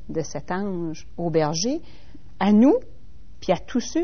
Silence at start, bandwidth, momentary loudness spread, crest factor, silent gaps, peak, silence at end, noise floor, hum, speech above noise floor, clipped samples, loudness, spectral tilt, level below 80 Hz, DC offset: 0.05 s; 6.6 kHz; 14 LU; 16 dB; none; -6 dBFS; 0 s; -48 dBFS; none; 26 dB; under 0.1%; -23 LUFS; -6 dB/octave; -48 dBFS; 2%